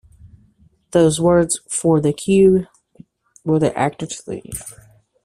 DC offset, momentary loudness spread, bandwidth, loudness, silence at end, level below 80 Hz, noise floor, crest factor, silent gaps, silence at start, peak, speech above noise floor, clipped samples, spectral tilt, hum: under 0.1%; 16 LU; 14.5 kHz; -17 LUFS; 0.55 s; -48 dBFS; -55 dBFS; 16 dB; none; 0.95 s; -2 dBFS; 38 dB; under 0.1%; -5.5 dB/octave; none